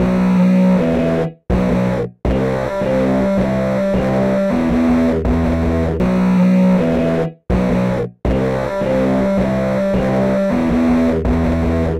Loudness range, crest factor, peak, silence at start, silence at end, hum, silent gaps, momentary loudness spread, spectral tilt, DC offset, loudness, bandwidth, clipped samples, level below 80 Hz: 2 LU; 8 dB; -8 dBFS; 0 s; 0 s; none; none; 6 LU; -8.5 dB/octave; under 0.1%; -16 LUFS; 10 kHz; under 0.1%; -28 dBFS